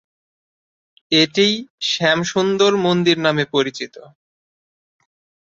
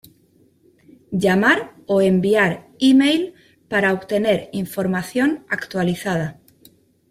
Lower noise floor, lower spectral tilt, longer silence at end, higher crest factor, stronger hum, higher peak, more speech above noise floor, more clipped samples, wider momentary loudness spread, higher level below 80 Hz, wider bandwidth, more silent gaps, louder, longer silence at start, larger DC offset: first, under -90 dBFS vs -57 dBFS; second, -4 dB/octave vs -6 dB/octave; first, 1.4 s vs 0.8 s; about the same, 18 dB vs 18 dB; neither; about the same, -2 dBFS vs -2 dBFS; first, over 72 dB vs 39 dB; neither; second, 7 LU vs 10 LU; about the same, -62 dBFS vs -58 dBFS; second, 7.8 kHz vs 15.5 kHz; first, 1.70-1.78 s vs none; about the same, -17 LUFS vs -19 LUFS; about the same, 1.1 s vs 1.1 s; neither